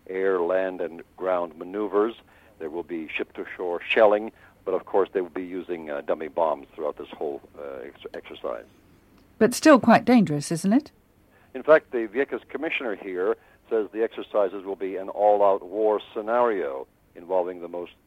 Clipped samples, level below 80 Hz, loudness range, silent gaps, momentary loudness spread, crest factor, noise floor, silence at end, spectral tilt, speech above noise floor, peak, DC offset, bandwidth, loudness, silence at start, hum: under 0.1%; -64 dBFS; 9 LU; none; 16 LU; 22 dB; -58 dBFS; 0.15 s; -5.5 dB/octave; 34 dB; -4 dBFS; under 0.1%; 15.5 kHz; -25 LUFS; 0.1 s; none